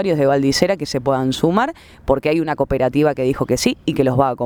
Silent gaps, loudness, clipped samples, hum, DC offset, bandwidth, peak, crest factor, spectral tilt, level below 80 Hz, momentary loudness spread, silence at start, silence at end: none; -18 LUFS; under 0.1%; none; under 0.1%; over 20 kHz; 0 dBFS; 18 dB; -5.5 dB/octave; -40 dBFS; 4 LU; 0 s; 0 s